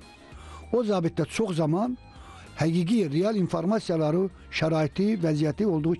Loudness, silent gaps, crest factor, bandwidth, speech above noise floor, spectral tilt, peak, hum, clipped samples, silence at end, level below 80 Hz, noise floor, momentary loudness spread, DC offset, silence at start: -26 LUFS; none; 14 dB; 12 kHz; 21 dB; -7 dB/octave; -12 dBFS; none; under 0.1%; 0 s; -52 dBFS; -46 dBFS; 12 LU; under 0.1%; 0 s